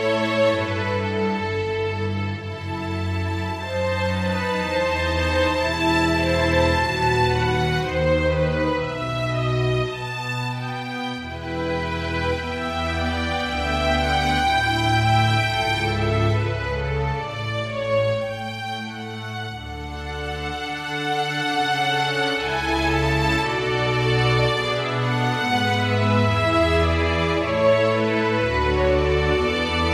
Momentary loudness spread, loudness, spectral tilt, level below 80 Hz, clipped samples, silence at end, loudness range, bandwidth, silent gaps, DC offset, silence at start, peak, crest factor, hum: 9 LU; -22 LUFS; -5.5 dB/octave; -34 dBFS; under 0.1%; 0 s; 6 LU; 15 kHz; none; under 0.1%; 0 s; -6 dBFS; 16 dB; none